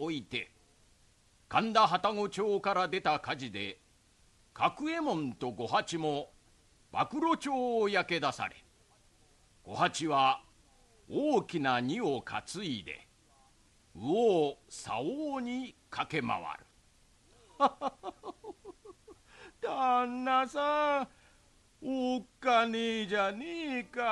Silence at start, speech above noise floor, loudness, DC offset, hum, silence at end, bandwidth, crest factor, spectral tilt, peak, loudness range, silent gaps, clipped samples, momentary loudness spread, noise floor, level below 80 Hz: 0 s; 34 dB; -32 LUFS; under 0.1%; none; 0 s; 12 kHz; 22 dB; -4.5 dB/octave; -12 dBFS; 5 LU; none; under 0.1%; 14 LU; -66 dBFS; -68 dBFS